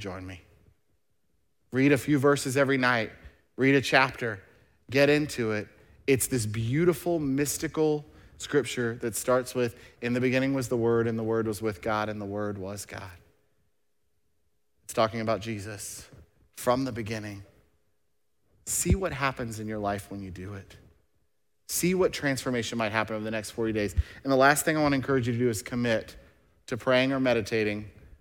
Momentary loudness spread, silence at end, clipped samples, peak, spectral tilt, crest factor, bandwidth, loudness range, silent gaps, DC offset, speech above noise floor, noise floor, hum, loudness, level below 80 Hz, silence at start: 15 LU; 0.3 s; under 0.1%; -6 dBFS; -5 dB/octave; 22 dB; 17.5 kHz; 9 LU; none; under 0.1%; 52 dB; -79 dBFS; none; -27 LUFS; -50 dBFS; 0 s